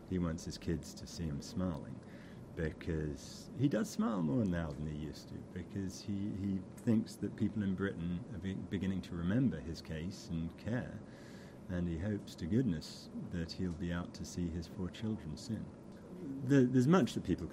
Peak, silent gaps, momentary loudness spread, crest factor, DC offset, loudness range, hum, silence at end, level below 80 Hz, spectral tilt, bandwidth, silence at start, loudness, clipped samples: -16 dBFS; none; 14 LU; 20 dB; under 0.1%; 4 LU; none; 0 s; -56 dBFS; -7 dB/octave; 15.5 kHz; 0 s; -38 LUFS; under 0.1%